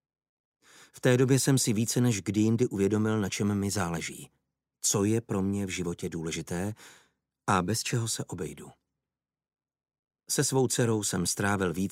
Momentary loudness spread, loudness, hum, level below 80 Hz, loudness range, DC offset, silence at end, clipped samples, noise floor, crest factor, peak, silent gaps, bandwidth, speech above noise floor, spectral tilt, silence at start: 11 LU; -28 LUFS; none; -62 dBFS; 7 LU; under 0.1%; 0 s; under 0.1%; under -90 dBFS; 20 dB; -10 dBFS; 9.99-10.03 s; 16 kHz; over 62 dB; -4.5 dB/octave; 0.95 s